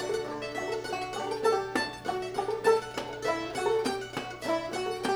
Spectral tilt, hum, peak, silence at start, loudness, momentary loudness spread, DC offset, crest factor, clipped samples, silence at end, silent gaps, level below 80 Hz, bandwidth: -4 dB/octave; none; -12 dBFS; 0 s; -31 LUFS; 8 LU; under 0.1%; 20 dB; under 0.1%; 0 s; none; -60 dBFS; over 20 kHz